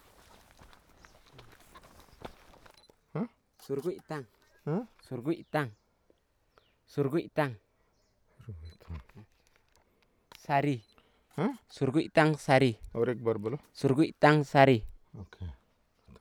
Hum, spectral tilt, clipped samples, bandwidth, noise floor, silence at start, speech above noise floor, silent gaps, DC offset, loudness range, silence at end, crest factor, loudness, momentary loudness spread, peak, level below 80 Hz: none; -7 dB/octave; under 0.1%; 16.5 kHz; -71 dBFS; 1.75 s; 43 dB; none; under 0.1%; 15 LU; 0.65 s; 24 dB; -30 LUFS; 24 LU; -8 dBFS; -58 dBFS